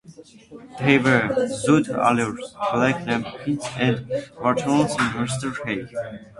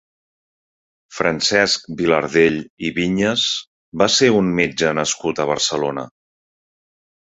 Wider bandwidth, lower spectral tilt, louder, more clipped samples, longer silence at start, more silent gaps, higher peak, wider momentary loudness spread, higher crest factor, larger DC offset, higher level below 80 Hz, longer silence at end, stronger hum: first, 11.5 kHz vs 8.4 kHz; first, -5.5 dB/octave vs -3.5 dB/octave; second, -22 LUFS vs -18 LUFS; neither; second, 0.05 s vs 1.1 s; second, none vs 2.70-2.77 s, 3.67-3.92 s; about the same, -2 dBFS vs 0 dBFS; about the same, 10 LU vs 10 LU; about the same, 22 dB vs 18 dB; neither; about the same, -54 dBFS vs -52 dBFS; second, 0.15 s vs 1.15 s; neither